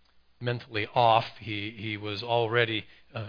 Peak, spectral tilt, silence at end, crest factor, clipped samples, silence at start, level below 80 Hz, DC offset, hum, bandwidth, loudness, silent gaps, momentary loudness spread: -8 dBFS; -7 dB/octave; 0 s; 20 dB; under 0.1%; 0.4 s; -66 dBFS; under 0.1%; none; 5.2 kHz; -28 LUFS; none; 12 LU